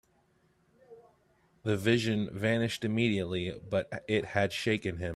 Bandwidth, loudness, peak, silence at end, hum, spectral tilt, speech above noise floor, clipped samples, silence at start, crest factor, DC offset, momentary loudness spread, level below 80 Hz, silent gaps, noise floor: 14 kHz; -31 LUFS; -12 dBFS; 0 s; none; -6 dB/octave; 39 dB; under 0.1%; 0.9 s; 20 dB; under 0.1%; 6 LU; -62 dBFS; none; -69 dBFS